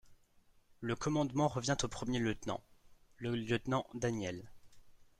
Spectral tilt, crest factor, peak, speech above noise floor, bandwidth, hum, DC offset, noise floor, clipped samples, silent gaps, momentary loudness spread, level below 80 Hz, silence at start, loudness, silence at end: -5 dB/octave; 20 dB; -20 dBFS; 31 dB; 13.5 kHz; none; under 0.1%; -67 dBFS; under 0.1%; none; 10 LU; -58 dBFS; 0.05 s; -37 LUFS; 0.15 s